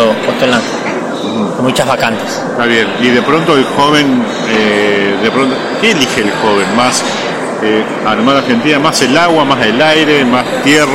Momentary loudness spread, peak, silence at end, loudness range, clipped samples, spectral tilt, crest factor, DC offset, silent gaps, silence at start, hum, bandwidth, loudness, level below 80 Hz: 7 LU; 0 dBFS; 0 s; 2 LU; under 0.1%; -4 dB/octave; 10 dB; under 0.1%; none; 0 s; none; 16.5 kHz; -10 LUFS; -48 dBFS